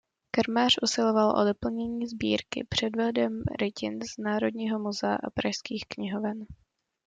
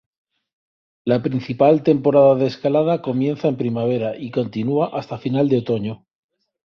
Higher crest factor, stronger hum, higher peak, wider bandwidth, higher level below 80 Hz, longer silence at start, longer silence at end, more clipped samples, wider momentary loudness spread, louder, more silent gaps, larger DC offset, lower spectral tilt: about the same, 18 dB vs 16 dB; neither; second, -10 dBFS vs -2 dBFS; first, 9.2 kHz vs 6.6 kHz; about the same, -58 dBFS vs -60 dBFS; second, 0.35 s vs 1.05 s; second, 0.55 s vs 0.7 s; neither; about the same, 11 LU vs 10 LU; second, -28 LUFS vs -19 LUFS; neither; neither; second, -4.5 dB/octave vs -9 dB/octave